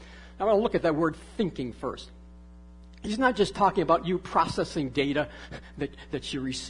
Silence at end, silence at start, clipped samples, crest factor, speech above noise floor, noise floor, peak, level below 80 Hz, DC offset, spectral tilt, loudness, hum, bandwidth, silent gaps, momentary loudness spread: 0 s; 0 s; under 0.1%; 20 dB; 21 dB; -48 dBFS; -8 dBFS; -48 dBFS; under 0.1%; -5.5 dB/octave; -28 LUFS; none; 11 kHz; none; 14 LU